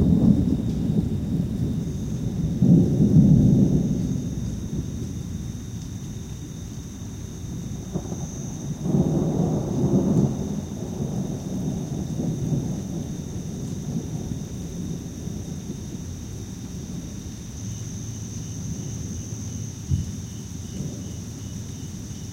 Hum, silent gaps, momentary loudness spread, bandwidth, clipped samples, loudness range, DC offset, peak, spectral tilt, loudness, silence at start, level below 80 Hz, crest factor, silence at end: none; none; 16 LU; 16.5 kHz; under 0.1%; 13 LU; under 0.1%; -4 dBFS; -7.5 dB/octave; -26 LUFS; 0 s; -38 dBFS; 20 dB; 0 s